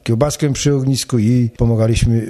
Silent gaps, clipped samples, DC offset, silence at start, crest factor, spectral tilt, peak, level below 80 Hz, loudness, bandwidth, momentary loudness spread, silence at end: none; under 0.1%; under 0.1%; 0.05 s; 14 dB; -6 dB/octave; -2 dBFS; -30 dBFS; -16 LUFS; 13.5 kHz; 2 LU; 0 s